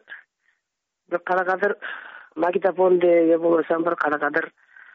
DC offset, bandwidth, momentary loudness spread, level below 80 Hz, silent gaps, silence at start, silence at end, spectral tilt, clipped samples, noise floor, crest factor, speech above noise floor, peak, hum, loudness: under 0.1%; 5.6 kHz; 15 LU; -74 dBFS; none; 0.1 s; 0.45 s; -4.5 dB/octave; under 0.1%; -81 dBFS; 14 dB; 60 dB; -8 dBFS; none; -21 LUFS